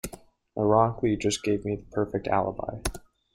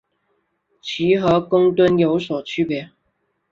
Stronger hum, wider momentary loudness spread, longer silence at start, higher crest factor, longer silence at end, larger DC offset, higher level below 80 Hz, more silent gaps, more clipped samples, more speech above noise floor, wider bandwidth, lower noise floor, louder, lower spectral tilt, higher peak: neither; about the same, 12 LU vs 12 LU; second, 0.05 s vs 0.85 s; about the same, 20 dB vs 16 dB; second, 0.35 s vs 0.65 s; neither; first, -46 dBFS vs -54 dBFS; neither; neither; second, 23 dB vs 52 dB; first, 16 kHz vs 7.4 kHz; second, -49 dBFS vs -70 dBFS; second, -27 LUFS vs -18 LUFS; second, -5.5 dB/octave vs -7 dB/octave; second, -8 dBFS vs -4 dBFS